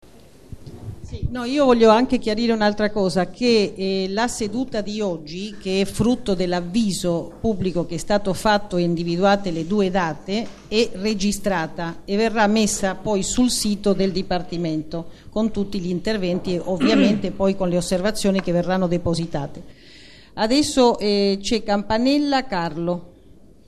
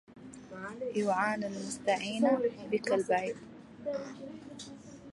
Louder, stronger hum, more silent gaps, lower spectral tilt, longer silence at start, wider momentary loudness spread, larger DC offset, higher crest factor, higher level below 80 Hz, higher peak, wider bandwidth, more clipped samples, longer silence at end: first, -21 LUFS vs -33 LUFS; neither; neither; about the same, -5 dB/octave vs -4.5 dB/octave; first, 0.5 s vs 0.1 s; second, 10 LU vs 18 LU; first, 0.5% vs under 0.1%; about the same, 20 dB vs 18 dB; first, -40 dBFS vs -72 dBFS; first, -2 dBFS vs -16 dBFS; first, 13 kHz vs 11.5 kHz; neither; first, 0.5 s vs 0 s